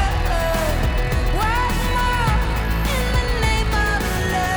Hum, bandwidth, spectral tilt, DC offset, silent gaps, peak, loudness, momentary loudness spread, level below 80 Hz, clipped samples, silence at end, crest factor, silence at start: none; over 20 kHz; -5 dB/octave; under 0.1%; none; -8 dBFS; -20 LUFS; 2 LU; -22 dBFS; under 0.1%; 0 s; 12 dB; 0 s